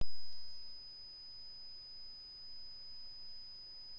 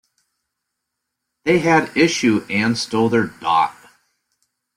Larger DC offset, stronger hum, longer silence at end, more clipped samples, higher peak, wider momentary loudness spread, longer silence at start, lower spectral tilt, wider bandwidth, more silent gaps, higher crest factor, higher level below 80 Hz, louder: neither; neither; second, 0 s vs 1.05 s; neither; second, -24 dBFS vs -2 dBFS; second, 0 LU vs 5 LU; second, 0 s vs 1.45 s; about the same, -3.5 dB/octave vs -4.5 dB/octave; second, 8 kHz vs 15 kHz; neither; about the same, 14 dB vs 18 dB; second, -66 dBFS vs -58 dBFS; second, -50 LUFS vs -18 LUFS